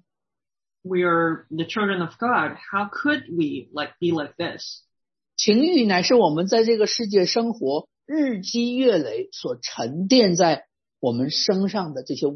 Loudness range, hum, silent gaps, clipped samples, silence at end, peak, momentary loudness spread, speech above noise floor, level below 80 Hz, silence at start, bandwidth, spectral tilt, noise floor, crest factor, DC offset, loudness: 5 LU; none; none; under 0.1%; 0 s; -4 dBFS; 12 LU; over 68 dB; -70 dBFS; 0.85 s; 6.4 kHz; -4.5 dB/octave; under -90 dBFS; 18 dB; under 0.1%; -22 LUFS